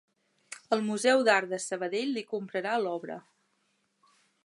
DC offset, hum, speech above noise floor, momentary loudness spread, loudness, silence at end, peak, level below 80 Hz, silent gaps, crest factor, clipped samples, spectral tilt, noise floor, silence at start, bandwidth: under 0.1%; none; 46 dB; 19 LU; -29 LUFS; 1.25 s; -10 dBFS; -86 dBFS; none; 22 dB; under 0.1%; -3.5 dB/octave; -74 dBFS; 0.5 s; 11.5 kHz